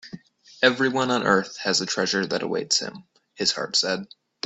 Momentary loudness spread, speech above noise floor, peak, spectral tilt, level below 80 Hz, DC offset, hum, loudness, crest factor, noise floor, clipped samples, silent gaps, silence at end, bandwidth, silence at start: 6 LU; 20 dB; -4 dBFS; -2.5 dB/octave; -66 dBFS; under 0.1%; none; -23 LUFS; 22 dB; -44 dBFS; under 0.1%; none; 0.4 s; 8.4 kHz; 0.05 s